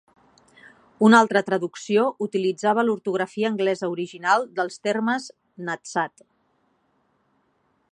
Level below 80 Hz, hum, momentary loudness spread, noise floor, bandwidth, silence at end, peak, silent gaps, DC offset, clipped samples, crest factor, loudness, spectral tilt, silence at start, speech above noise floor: -76 dBFS; none; 12 LU; -68 dBFS; 10.5 kHz; 1.85 s; -2 dBFS; none; under 0.1%; under 0.1%; 22 dB; -22 LUFS; -5 dB/octave; 1 s; 46 dB